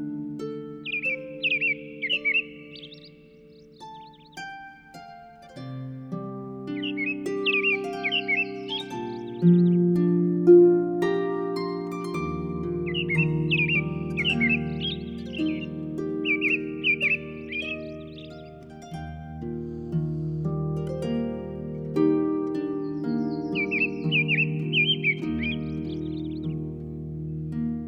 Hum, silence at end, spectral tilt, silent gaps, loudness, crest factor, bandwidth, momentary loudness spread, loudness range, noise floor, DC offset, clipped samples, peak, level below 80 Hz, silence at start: none; 0 s; -7 dB/octave; none; -25 LUFS; 20 dB; 8.8 kHz; 18 LU; 12 LU; -50 dBFS; under 0.1%; under 0.1%; -6 dBFS; -50 dBFS; 0 s